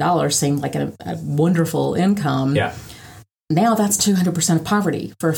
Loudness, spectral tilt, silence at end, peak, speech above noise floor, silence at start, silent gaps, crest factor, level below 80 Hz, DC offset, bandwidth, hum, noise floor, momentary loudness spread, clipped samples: -19 LUFS; -5 dB/octave; 0 s; -4 dBFS; 25 dB; 0 s; none; 14 dB; -54 dBFS; under 0.1%; 19 kHz; none; -43 dBFS; 9 LU; under 0.1%